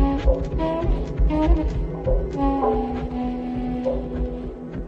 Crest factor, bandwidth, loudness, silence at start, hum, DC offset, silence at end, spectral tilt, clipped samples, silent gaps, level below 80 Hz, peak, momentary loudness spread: 16 dB; 6.4 kHz; -24 LUFS; 0 s; none; under 0.1%; 0 s; -9 dB/octave; under 0.1%; none; -26 dBFS; -6 dBFS; 7 LU